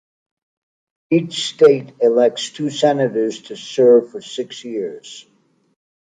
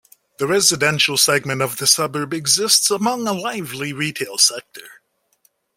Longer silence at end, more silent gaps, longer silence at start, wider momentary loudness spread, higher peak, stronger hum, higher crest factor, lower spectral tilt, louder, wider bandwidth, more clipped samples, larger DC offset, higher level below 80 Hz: first, 1 s vs 0.85 s; neither; first, 1.1 s vs 0.4 s; first, 16 LU vs 11 LU; about the same, -2 dBFS vs 0 dBFS; neither; about the same, 16 dB vs 20 dB; first, -5 dB/octave vs -2 dB/octave; about the same, -17 LUFS vs -17 LUFS; second, 9.4 kHz vs 16.5 kHz; neither; neither; second, -72 dBFS vs -60 dBFS